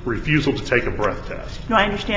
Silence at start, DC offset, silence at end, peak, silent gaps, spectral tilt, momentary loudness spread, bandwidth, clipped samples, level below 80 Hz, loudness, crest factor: 0 s; under 0.1%; 0 s; 0 dBFS; none; -6 dB/octave; 13 LU; 7.8 kHz; under 0.1%; -34 dBFS; -20 LUFS; 20 dB